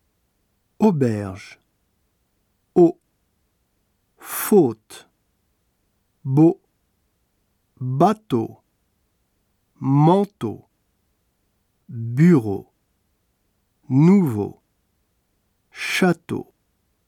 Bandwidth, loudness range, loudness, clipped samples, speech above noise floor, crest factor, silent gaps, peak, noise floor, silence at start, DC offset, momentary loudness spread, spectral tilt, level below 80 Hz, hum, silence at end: 19 kHz; 5 LU; -20 LUFS; under 0.1%; 51 dB; 20 dB; none; -4 dBFS; -69 dBFS; 0.8 s; under 0.1%; 19 LU; -7 dB/octave; -66 dBFS; none; 0.65 s